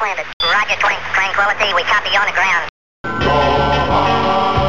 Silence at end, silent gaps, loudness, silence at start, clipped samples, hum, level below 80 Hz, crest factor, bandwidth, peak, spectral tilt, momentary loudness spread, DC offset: 0 s; 0.33-0.40 s, 2.69-3.04 s; -14 LUFS; 0 s; under 0.1%; none; -34 dBFS; 14 dB; 15.5 kHz; -2 dBFS; -4 dB/octave; 5 LU; under 0.1%